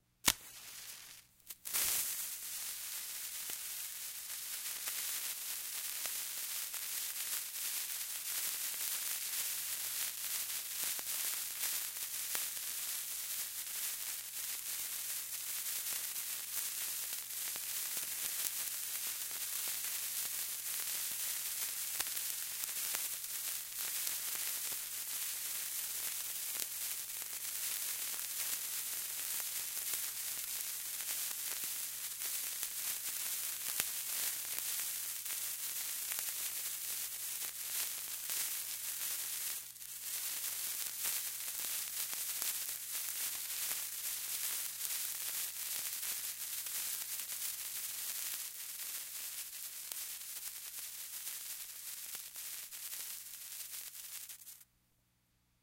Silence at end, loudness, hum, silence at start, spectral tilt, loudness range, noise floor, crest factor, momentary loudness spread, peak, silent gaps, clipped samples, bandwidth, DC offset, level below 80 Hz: 1 s; -38 LUFS; 60 Hz at -75 dBFS; 0.25 s; 2.5 dB/octave; 4 LU; -76 dBFS; 34 dB; 6 LU; -6 dBFS; none; under 0.1%; 17 kHz; under 0.1%; -76 dBFS